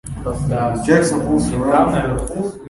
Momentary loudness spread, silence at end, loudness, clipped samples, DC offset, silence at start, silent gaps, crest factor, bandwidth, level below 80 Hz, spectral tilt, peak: 8 LU; 0 s; -17 LUFS; under 0.1%; under 0.1%; 0.05 s; none; 16 dB; 11.5 kHz; -32 dBFS; -6.5 dB/octave; 0 dBFS